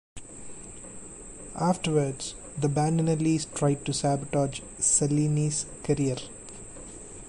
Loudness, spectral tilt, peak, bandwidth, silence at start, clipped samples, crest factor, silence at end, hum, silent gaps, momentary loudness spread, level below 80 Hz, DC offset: -27 LUFS; -5 dB/octave; -10 dBFS; 11.5 kHz; 0.15 s; under 0.1%; 18 dB; 0 s; none; none; 18 LU; -52 dBFS; under 0.1%